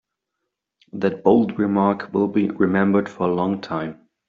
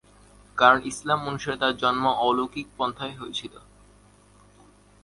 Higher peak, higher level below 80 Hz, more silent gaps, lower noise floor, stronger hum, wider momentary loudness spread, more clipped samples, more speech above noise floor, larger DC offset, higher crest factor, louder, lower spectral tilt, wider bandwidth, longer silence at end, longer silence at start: about the same, -2 dBFS vs -2 dBFS; about the same, -60 dBFS vs -58 dBFS; neither; first, -80 dBFS vs -55 dBFS; second, none vs 50 Hz at -55 dBFS; second, 10 LU vs 15 LU; neither; first, 60 dB vs 31 dB; neither; second, 18 dB vs 24 dB; first, -20 LUFS vs -24 LUFS; first, -7 dB/octave vs -4 dB/octave; second, 7 kHz vs 11.5 kHz; second, 0.35 s vs 1.45 s; first, 0.95 s vs 0.55 s